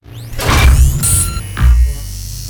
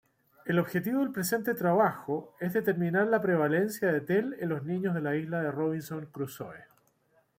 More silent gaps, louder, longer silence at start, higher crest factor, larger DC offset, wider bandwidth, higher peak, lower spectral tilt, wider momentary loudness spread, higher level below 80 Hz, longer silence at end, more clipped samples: neither; first, -12 LUFS vs -30 LUFS; second, 0.1 s vs 0.45 s; about the same, 12 dB vs 16 dB; neither; first, 20 kHz vs 16.5 kHz; first, 0 dBFS vs -14 dBFS; second, -3.5 dB/octave vs -6.5 dB/octave; first, 14 LU vs 11 LU; first, -14 dBFS vs -72 dBFS; second, 0 s vs 0.75 s; neither